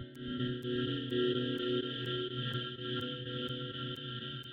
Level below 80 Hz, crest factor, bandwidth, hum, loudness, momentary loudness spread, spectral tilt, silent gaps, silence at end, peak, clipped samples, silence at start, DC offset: -66 dBFS; 16 dB; 15.5 kHz; none; -37 LUFS; 7 LU; -7 dB/octave; none; 0 s; -22 dBFS; under 0.1%; 0 s; under 0.1%